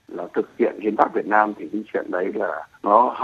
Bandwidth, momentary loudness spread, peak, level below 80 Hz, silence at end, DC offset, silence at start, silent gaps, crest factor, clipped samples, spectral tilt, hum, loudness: 7.4 kHz; 10 LU; 0 dBFS; -70 dBFS; 0 s; under 0.1%; 0.1 s; none; 22 dB; under 0.1%; -7.5 dB/octave; none; -22 LUFS